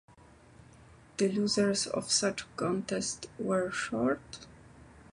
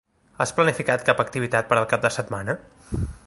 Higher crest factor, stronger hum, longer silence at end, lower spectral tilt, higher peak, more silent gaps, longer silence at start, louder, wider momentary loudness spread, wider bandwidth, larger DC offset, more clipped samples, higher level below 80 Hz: about the same, 18 dB vs 22 dB; neither; about the same, 0.1 s vs 0.1 s; second, -3.5 dB/octave vs -5 dB/octave; second, -14 dBFS vs -2 dBFS; neither; first, 0.9 s vs 0.4 s; second, -31 LUFS vs -23 LUFS; about the same, 9 LU vs 10 LU; about the same, 11.5 kHz vs 11.5 kHz; neither; neither; second, -62 dBFS vs -42 dBFS